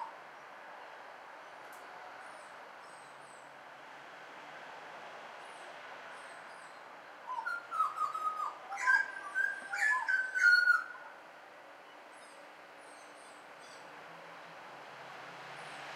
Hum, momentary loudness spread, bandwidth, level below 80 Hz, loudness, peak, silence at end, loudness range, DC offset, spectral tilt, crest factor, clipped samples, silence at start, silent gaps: none; 23 LU; 16 kHz; under -90 dBFS; -32 LUFS; -16 dBFS; 0 s; 20 LU; under 0.1%; -0.5 dB/octave; 22 dB; under 0.1%; 0 s; none